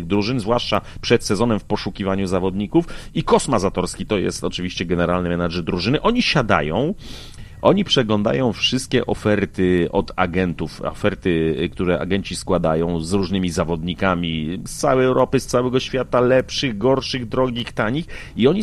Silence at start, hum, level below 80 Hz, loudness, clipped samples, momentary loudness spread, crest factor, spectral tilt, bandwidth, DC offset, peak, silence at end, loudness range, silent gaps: 0 s; none; -38 dBFS; -20 LUFS; under 0.1%; 7 LU; 20 dB; -5.5 dB/octave; 13 kHz; under 0.1%; 0 dBFS; 0 s; 2 LU; none